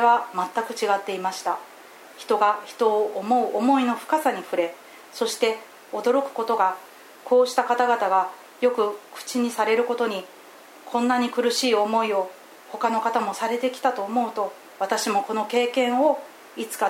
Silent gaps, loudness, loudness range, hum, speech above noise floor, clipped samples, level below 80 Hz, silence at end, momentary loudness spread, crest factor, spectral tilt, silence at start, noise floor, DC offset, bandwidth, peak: none; -24 LUFS; 2 LU; none; 23 dB; under 0.1%; -88 dBFS; 0 s; 12 LU; 18 dB; -3 dB/octave; 0 s; -46 dBFS; under 0.1%; 16.5 kHz; -6 dBFS